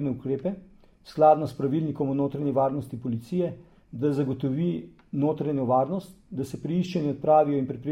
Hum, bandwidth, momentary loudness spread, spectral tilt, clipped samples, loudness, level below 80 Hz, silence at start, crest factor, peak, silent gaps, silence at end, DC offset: none; 13 kHz; 14 LU; -9 dB/octave; under 0.1%; -26 LUFS; -60 dBFS; 0 s; 18 dB; -8 dBFS; none; 0 s; under 0.1%